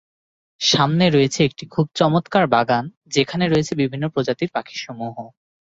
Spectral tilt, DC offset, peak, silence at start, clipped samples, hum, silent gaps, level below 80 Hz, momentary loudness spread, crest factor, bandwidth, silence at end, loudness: -5 dB/octave; under 0.1%; -2 dBFS; 0.6 s; under 0.1%; none; 2.97-3.01 s; -54 dBFS; 13 LU; 18 dB; 8 kHz; 0.5 s; -19 LUFS